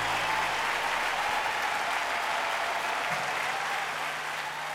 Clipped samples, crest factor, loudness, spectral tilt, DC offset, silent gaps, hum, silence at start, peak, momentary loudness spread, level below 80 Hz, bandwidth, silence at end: under 0.1%; 14 dB; -29 LUFS; -1 dB/octave; under 0.1%; none; none; 0 s; -16 dBFS; 4 LU; -62 dBFS; 19.5 kHz; 0 s